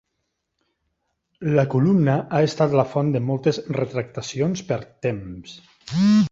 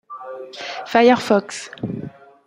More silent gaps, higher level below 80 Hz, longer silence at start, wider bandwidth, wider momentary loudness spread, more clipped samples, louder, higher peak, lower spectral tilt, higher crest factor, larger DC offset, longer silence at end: neither; first, -56 dBFS vs -64 dBFS; first, 1.4 s vs 0.1 s; second, 7.8 kHz vs 15.5 kHz; second, 13 LU vs 19 LU; neither; second, -22 LUFS vs -18 LUFS; about the same, -4 dBFS vs -2 dBFS; first, -7 dB/octave vs -5 dB/octave; about the same, 18 dB vs 18 dB; neither; second, 0.05 s vs 0.35 s